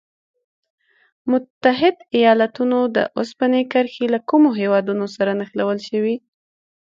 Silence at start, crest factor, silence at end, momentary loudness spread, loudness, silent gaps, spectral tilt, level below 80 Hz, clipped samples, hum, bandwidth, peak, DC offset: 1.25 s; 18 dB; 0.7 s; 7 LU; -19 LUFS; 1.50-1.61 s; -6.5 dB/octave; -68 dBFS; under 0.1%; none; 7.6 kHz; -2 dBFS; under 0.1%